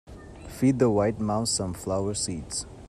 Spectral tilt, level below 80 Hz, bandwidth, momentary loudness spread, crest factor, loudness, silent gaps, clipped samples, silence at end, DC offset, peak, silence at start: -5 dB/octave; -48 dBFS; 14.5 kHz; 16 LU; 18 dB; -26 LUFS; none; under 0.1%; 0 s; under 0.1%; -10 dBFS; 0.05 s